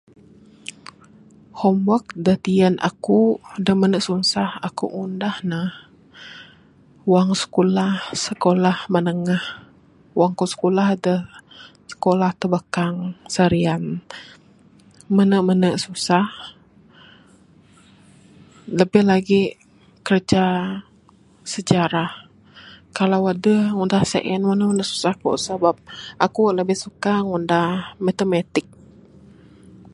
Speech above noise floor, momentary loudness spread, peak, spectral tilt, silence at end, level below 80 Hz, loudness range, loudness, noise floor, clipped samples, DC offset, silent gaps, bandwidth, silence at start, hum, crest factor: 33 dB; 14 LU; 0 dBFS; -6 dB/octave; 1.35 s; -56 dBFS; 3 LU; -20 LUFS; -53 dBFS; under 0.1%; under 0.1%; none; 11.5 kHz; 1.55 s; none; 20 dB